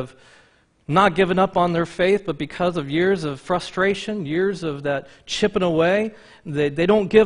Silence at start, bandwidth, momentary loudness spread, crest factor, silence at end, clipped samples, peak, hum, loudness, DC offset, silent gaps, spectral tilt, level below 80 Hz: 0 s; 10.5 kHz; 11 LU; 18 dB; 0 s; under 0.1%; -2 dBFS; none; -21 LUFS; under 0.1%; none; -6 dB/octave; -50 dBFS